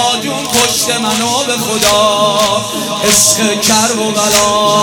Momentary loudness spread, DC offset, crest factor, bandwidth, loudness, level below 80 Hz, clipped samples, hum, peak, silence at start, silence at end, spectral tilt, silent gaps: 6 LU; under 0.1%; 12 dB; over 20 kHz; -10 LUFS; -44 dBFS; 0.2%; none; 0 dBFS; 0 s; 0 s; -1.5 dB/octave; none